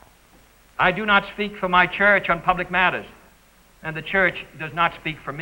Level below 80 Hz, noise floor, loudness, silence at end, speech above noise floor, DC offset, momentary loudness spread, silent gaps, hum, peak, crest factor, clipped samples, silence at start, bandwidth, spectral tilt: -48 dBFS; -54 dBFS; -20 LUFS; 0 s; 33 dB; under 0.1%; 15 LU; none; none; -4 dBFS; 20 dB; under 0.1%; 0.8 s; 16 kHz; -5.5 dB/octave